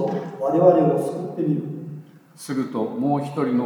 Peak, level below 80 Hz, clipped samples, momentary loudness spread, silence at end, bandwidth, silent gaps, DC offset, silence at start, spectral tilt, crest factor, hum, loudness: -2 dBFS; -78 dBFS; under 0.1%; 18 LU; 0 s; 19 kHz; none; under 0.1%; 0 s; -8 dB/octave; 20 dB; none; -22 LUFS